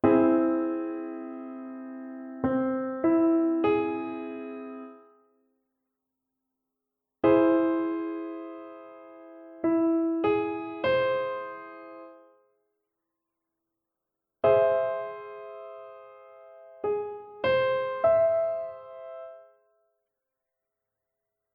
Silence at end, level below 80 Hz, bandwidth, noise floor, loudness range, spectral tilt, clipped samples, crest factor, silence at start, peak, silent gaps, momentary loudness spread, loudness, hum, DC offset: 2.15 s; -66 dBFS; 5.2 kHz; -86 dBFS; 6 LU; -9.5 dB/octave; under 0.1%; 20 dB; 0.05 s; -10 dBFS; none; 21 LU; -27 LUFS; none; under 0.1%